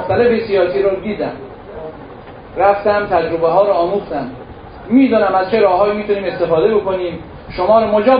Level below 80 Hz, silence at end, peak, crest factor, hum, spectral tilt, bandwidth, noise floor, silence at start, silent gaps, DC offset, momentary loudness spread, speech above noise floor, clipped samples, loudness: -42 dBFS; 0 s; 0 dBFS; 14 dB; none; -10.5 dB/octave; 5.2 kHz; -34 dBFS; 0 s; none; under 0.1%; 19 LU; 20 dB; under 0.1%; -15 LUFS